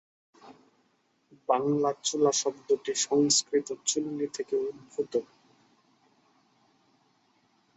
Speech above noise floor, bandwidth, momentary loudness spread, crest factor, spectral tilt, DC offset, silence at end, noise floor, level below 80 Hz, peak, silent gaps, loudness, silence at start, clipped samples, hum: 43 dB; 8.4 kHz; 10 LU; 22 dB; -3 dB/octave; under 0.1%; 2.55 s; -71 dBFS; -76 dBFS; -10 dBFS; none; -28 LUFS; 0.45 s; under 0.1%; none